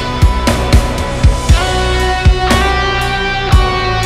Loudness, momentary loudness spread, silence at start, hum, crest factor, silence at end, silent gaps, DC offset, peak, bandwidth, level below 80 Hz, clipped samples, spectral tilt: -12 LUFS; 3 LU; 0 s; none; 12 dB; 0 s; none; under 0.1%; 0 dBFS; 14.5 kHz; -14 dBFS; under 0.1%; -5 dB/octave